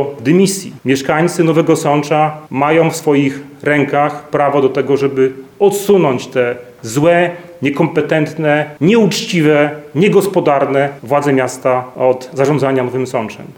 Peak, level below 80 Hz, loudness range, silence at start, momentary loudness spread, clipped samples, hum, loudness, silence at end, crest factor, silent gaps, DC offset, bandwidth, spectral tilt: 0 dBFS; -58 dBFS; 1 LU; 0 s; 6 LU; under 0.1%; none; -14 LUFS; 0.05 s; 14 dB; none; under 0.1%; 20 kHz; -5.5 dB/octave